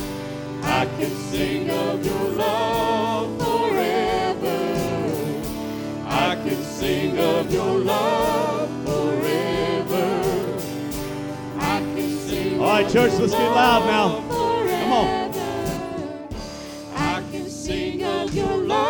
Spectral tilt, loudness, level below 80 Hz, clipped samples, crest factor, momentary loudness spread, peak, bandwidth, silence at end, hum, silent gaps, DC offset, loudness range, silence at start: -5 dB/octave; -22 LUFS; -44 dBFS; under 0.1%; 18 dB; 10 LU; -4 dBFS; 19 kHz; 0 s; none; none; under 0.1%; 5 LU; 0 s